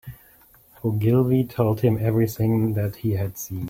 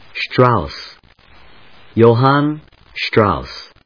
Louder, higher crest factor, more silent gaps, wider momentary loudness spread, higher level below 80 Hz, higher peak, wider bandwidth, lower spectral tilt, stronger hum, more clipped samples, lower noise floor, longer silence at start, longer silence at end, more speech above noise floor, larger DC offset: second, -22 LUFS vs -15 LUFS; about the same, 16 dB vs 16 dB; neither; second, 8 LU vs 20 LU; second, -50 dBFS vs -42 dBFS; second, -6 dBFS vs 0 dBFS; first, 16.5 kHz vs 5.4 kHz; about the same, -8 dB/octave vs -8 dB/octave; neither; second, under 0.1% vs 0.1%; first, -54 dBFS vs -46 dBFS; about the same, 0.05 s vs 0.15 s; second, 0 s vs 0.2 s; about the same, 32 dB vs 32 dB; second, under 0.1% vs 0.3%